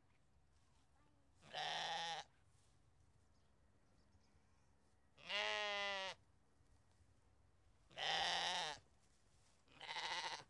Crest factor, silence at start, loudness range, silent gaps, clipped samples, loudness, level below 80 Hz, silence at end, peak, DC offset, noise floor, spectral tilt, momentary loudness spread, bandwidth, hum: 24 dB; 1.4 s; 6 LU; none; under 0.1%; -44 LUFS; -80 dBFS; 0.05 s; -26 dBFS; under 0.1%; -77 dBFS; -0.5 dB/octave; 17 LU; 11.5 kHz; none